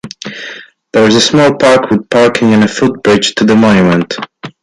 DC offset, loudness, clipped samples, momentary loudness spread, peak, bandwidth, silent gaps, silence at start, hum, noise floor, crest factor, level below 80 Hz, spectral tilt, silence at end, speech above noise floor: under 0.1%; -9 LUFS; under 0.1%; 16 LU; 0 dBFS; 11.5 kHz; none; 0.05 s; none; -29 dBFS; 10 dB; -44 dBFS; -5 dB/octave; 0.1 s; 21 dB